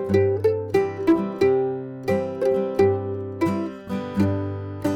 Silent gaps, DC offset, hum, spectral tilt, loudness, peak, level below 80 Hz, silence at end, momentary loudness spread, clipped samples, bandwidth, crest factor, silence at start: none; under 0.1%; none; -8 dB/octave; -23 LUFS; -8 dBFS; -56 dBFS; 0 s; 9 LU; under 0.1%; 13.5 kHz; 16 dB; 0 s